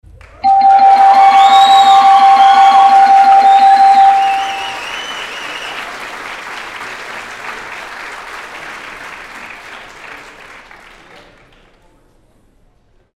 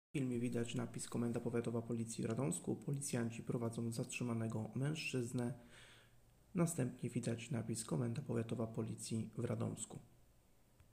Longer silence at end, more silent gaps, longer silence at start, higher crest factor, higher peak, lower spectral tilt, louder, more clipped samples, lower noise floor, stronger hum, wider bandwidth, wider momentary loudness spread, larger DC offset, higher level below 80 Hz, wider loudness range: first, 3.4 s vs 0.6 s; neither; first, 0.45 s vs 0.15 s; second, 12 dB vs 18 dB; first, 0 dBFS vs -24 dBFS; second, -1 dB/octave vs -6 dB/octave; first, -7 LUFS vs -42 LUFS; neither; second, -52 dBFS vs -70 dBFS; neither; second, 12 kHz vs 15.5 kHz; first, 23 LU vs 4 LU; neither; first, -50 dBFS vs -72 dBFS; first, 23 LU vs 2 LU